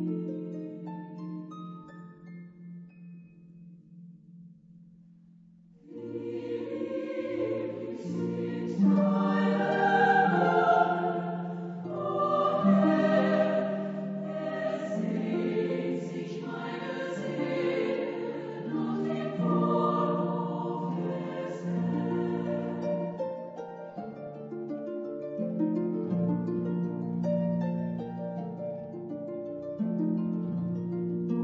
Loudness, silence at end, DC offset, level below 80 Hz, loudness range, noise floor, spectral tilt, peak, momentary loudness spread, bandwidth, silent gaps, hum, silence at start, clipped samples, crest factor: -30 LUFS; 0 s; under 0.1%; -74 dBFS; 16 LU; -56 dBFS; -8.5 dB/octave; -10 dBFS; 16 LU; 7.8 kHz; none; none; 0 s; under 0.1%; 20 dB